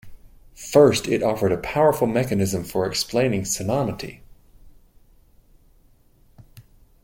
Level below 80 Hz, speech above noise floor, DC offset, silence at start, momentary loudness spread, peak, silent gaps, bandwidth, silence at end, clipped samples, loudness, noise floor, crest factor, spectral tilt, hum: -48 dBFS; 35 dB; under 0.1%; 0.05 s; 10 LU; -2 dBFS; none; 17 kHz; 0.4 s; under 0.1%; -21 LUFS; -56 dBFS; 20 dB; -5 dB/octave; none